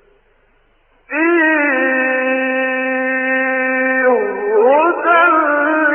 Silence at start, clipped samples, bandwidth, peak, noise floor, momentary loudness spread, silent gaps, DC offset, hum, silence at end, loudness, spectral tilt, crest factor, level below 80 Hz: 1.1 s; under 0.1%; 3.5 kHz; -2 dBFS; -55 dBFS; 5 LU; none; under 0.1%; none; 0 s; -14 LUFS; -0.5 dB/octave; 14 dB; -60 dBFS